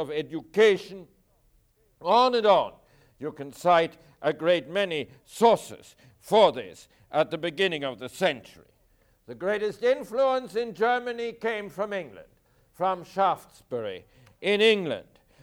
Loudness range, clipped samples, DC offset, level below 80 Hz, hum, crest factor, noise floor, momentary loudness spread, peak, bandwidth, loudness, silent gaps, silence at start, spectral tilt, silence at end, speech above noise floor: 5 LU; under 0.1%; under 0.1%; -66 dBFS; none; 20 dB; -65 dBFS; 16 LU; -8 dBFS; 16.5 kHz; -26 LUFS; none; 0 s; -4.5 dB/octave; 0.4 s; 39 dB